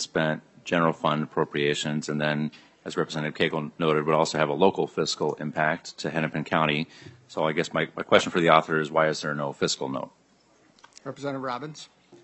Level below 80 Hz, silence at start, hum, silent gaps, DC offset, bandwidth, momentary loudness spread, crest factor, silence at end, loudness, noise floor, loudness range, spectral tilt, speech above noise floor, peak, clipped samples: -68 dBFS; 0 s; none; none; under 0.1%; 8.6 kHz; 12 LU; 24 dB; 0.1 s; -26 LUFS; -61 dBFS; 3 LU; -4.5 dB/octave; 35 dB; -2 dBFS; under 0.1%